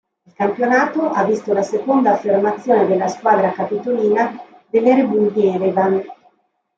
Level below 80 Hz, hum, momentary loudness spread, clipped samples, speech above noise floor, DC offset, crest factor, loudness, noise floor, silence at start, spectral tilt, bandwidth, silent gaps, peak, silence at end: -66 dBFS; none; 7 LU; under 0.1%; 44 dB; under 0.1%; 14 dB; -17 LUFS; -60 dBFS; 0.4 s; -7 dB/octave; 7.6 kHz; none; -2 dBFS; 0.65 s